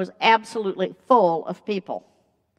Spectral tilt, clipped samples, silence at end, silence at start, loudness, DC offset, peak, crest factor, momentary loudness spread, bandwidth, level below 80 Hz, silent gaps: -5 dB/octave; under 0.1%; 0.6 s; 0 s; -22 LUFS; under 0.1%; -2 dBFS; 20 dB; 12 LU; 11.5 kHz; -80 dBFS; none